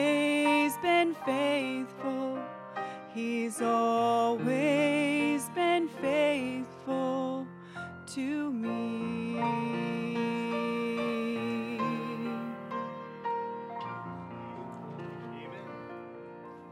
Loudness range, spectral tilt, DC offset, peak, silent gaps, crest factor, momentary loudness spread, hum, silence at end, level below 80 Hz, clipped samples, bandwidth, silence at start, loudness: 10 LU; -5 dB/octave; under 0.1%; -14 dBFS; none; 18 dB; 16 LU; none; 0 s; -74 dBFS; under 0.1%; 15.5 kHz; 0 s; -31 LUFS